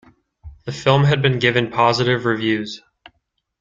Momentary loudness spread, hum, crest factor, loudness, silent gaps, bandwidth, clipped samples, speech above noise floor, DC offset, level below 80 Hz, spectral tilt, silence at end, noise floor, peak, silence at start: 16 LU; none; 18 dB; -17 LUFS; none; 7.6 kHz; under 0.1%; 53 dB; under 0.1%; -50 dBFS; -6 dB/octave; 0.85 s; -71 dBFS; -2 dBFS; 0.45 s